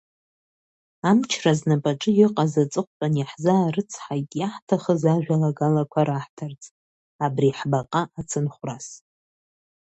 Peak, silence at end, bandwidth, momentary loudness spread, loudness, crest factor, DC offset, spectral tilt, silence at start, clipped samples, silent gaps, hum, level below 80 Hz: -4 dBFS; 0.95 s; 8.4 kHz; 11 LU; -23 LUFS; 18 dB; under 0.1%; -6.5 dB/octave; 1.05 s; under 0.1%; 2.87-3.00 s, 4.62-4.67 s, 6.29-6.37 s, 6.71-7.19 s; none; -64 dBFS